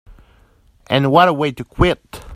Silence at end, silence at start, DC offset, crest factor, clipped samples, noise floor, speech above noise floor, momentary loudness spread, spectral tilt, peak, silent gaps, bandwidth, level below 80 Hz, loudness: 0 s; 0.1 s; under 0.1%; 18 dB; under 0.1%; -52 dBFS; 37 dB; 10 LU; -6.5 dB/octave; 0 dBFS; none; 15 kHz; -34 dBFS; -16 LUFS